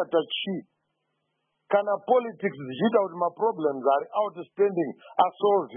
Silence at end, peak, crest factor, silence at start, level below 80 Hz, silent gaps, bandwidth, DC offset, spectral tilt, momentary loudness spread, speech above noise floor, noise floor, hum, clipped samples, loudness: 0 s; -8 dBFS; 18 dB; 0 s; -82 dBFS; none; 3.7 kHz; under 0.1%; -10 dB/octave; 8 LU; 52 dB; -77 dBFS; none; under 0.1%; -26 LUFS